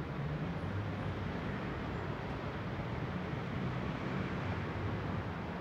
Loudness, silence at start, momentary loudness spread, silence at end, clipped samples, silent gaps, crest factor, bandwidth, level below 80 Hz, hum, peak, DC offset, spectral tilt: -39 LUFS; 0 s; 2 LU; 0 s; under 0.1%; none; 14 dB; 8.4 kHz; -52 dBFS; none; -26 dBFS; under 0.1%; -8 dB/octave